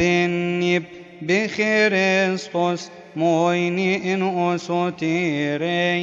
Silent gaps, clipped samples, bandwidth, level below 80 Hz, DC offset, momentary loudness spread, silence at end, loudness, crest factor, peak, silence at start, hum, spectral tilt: none; under 0.1%; 7.8 kHz; -66 dBFS; under 0.1%; 6 LU; 0 s; -21 LUFS; 14 dB; -6 dBFS; 0 s; none; -5.5 dB/octave